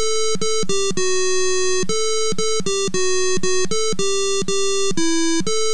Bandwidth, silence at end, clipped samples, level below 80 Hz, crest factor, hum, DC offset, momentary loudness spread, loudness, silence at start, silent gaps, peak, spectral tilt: 11 kHz; 0 s; under 0.1%; -50 dBFS; 12 dB; none; 10%; 1 LU; -20 LUFS; 0 s; none; -6 dBFS; -2.5 dB/octave